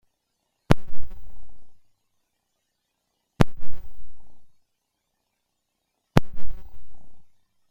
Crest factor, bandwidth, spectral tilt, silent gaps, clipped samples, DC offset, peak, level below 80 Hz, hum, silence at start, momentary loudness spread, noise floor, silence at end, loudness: 20 dB; 16.5 kHz; -7 dB/octave; none; under 0.1%; under 0.1%; 0 dBFS; -38 dBFS; none; 0.7 s; 23 LU; -78 dBFS; 0.5 s; -26 LUFS